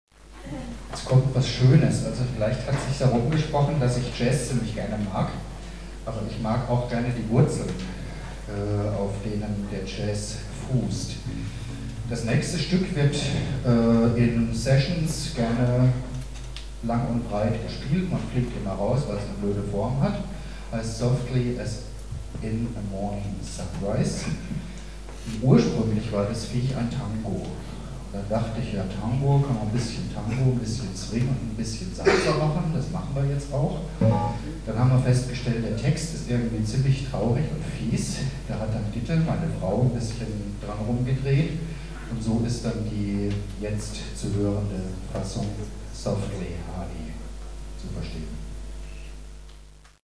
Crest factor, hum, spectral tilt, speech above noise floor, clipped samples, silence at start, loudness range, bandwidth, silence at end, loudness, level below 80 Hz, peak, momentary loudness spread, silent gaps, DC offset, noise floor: 22 dB; none; -6.5 dB/octave; 23 dB; under 0.1%; 0.05 s; 7 LU; 11 kHz; 0.1 s; -26 LUFS; -38 dBFS; -4 dBFS; 14 LU; none; 0.4%; -48 dBFS